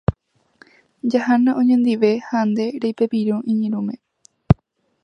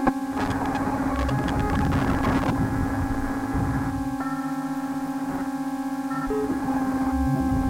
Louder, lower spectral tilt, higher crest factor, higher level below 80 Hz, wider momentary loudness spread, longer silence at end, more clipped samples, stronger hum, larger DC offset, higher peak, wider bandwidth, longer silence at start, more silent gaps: first, -19 LUFS vs -26 LUFS; first, -8.5 dB/octave vs -7 dB/octave; about the same, 20 dB vs 18 dB; about the same, -38 dBFS vs -36 dBFS; first, 9 LU vs 5 LU; first, 0.5 s vs 0 s; neither; neither; neither; first, 0 dBFS vs -6 dBFS; second, 6.8 kHz vs 16.5 kHz; about the same, 0.1 s vs 0 s; neither